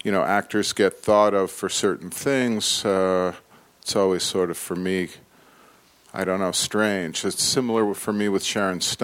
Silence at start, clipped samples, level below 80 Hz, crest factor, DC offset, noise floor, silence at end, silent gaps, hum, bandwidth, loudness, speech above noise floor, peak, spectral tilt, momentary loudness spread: 0.05 s; under 0.1%; -62 dBFS; 18 dB; under 0.1%; -54 dBFS; 0 s; none; none; 17 kHz; -22 LUFS; 32 dB; -4 dBFS; -3.5 dB/octave; 6 LU